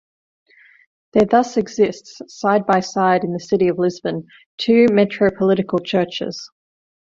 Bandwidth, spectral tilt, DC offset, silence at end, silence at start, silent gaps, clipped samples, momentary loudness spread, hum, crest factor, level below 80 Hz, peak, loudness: 7.6 kHz; -6 dB/octave; under 0.1%; 0.6 s; 1.15 s; 4.46-4.58 s; under 0.1%; 12 LU; none; 16 dB; -56 dBFS; -2 dBFS; -18 LUFS